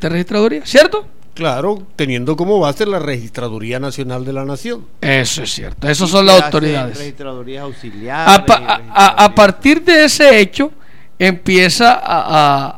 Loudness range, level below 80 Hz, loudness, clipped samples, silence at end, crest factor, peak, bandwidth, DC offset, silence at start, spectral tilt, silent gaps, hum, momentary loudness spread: 9 LU; -40 dBFS; -11 LUFS; 0.5%; 0.05 s; 12 dB; 0 dBFS; 17 kHz; 4%; 0 s; -4 dB/octave; none; none; 17 LU